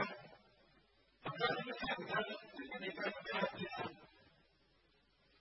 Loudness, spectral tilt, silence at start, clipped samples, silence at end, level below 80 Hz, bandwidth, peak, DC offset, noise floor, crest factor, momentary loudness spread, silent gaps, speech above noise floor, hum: -42 LUFS; -2 dB/octave; 0 s; under 0.1%; 1.15 s; -74 dBFS; 5.8 kHz; -22 dBFS; under 0.1%; -74 dBFS; 22 dB; 11 LU; none; 32 dB; none